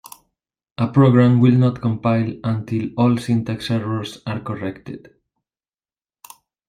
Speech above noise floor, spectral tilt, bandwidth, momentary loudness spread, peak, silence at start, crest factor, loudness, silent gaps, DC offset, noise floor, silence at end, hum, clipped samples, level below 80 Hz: over 72 dB; -8 dB/octave; 15 kHz; 15 LU; -2 dBFS; 0.8 s; 18 dB; -19 LUFS; none; under 0.1%; under -90 dBFS; 1.7 s; none; under 0.1%; -54 dBFS